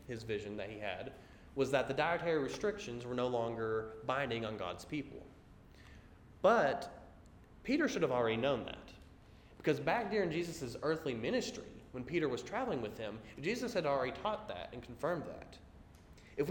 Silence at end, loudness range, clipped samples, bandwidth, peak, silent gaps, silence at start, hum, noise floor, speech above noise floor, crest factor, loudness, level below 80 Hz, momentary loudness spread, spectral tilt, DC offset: 0 s; 4 LU; under 0.1%; 17.5 kHz; -16 dBFS; none; 0 s; none; -59 dBFS; 22 dB; 22 dB; -37 LUFS; -62 dBFS; 16 LU; -5.5 dB/octave; under 0.1%